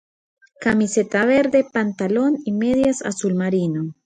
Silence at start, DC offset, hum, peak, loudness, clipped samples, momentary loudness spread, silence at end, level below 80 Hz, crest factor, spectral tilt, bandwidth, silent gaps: 0.6 s; under 0.1%; none; -4 dBFS; -19 LUFS; under 0.1%; 6 LU; 0.15 s; -54 dBFS; 16 dB; -6 dB/octave; 9.6 kHz; none